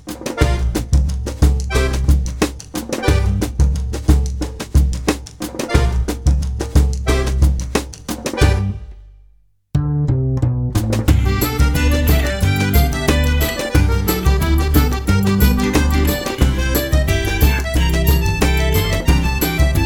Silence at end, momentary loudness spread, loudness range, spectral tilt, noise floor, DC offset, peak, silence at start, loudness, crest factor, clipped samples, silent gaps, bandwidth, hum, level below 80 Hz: 0 s; 6 LU; 3 LU; -5.5 dB/octave; -52 dBFS; under 0.1%; 0 dBFS; 0.05 s; -17 LUFS; 16 dB; under 0.1%; none; 19.5 kHz; none; -18 dBFS